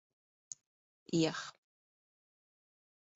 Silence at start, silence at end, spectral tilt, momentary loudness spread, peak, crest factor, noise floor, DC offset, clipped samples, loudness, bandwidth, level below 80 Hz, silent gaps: 1.1 s; 1.65 s; -4.5 dB/octave; 17 LU; -20 dBFS; 24 dB; under -90 dBFS; under 0.1%; under 0.1%; -36 LUFS; 8 kHz; -80 dBFS; none